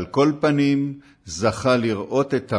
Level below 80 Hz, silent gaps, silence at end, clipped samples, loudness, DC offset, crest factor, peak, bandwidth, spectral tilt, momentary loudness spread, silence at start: -52 dBFS; none; 0 s; under 0.1%; -21 LUFS; under 0.1%; 14 dB; -6 dBFS; 10.5 kHz; -6 dB/octave; 10 LU; 0 s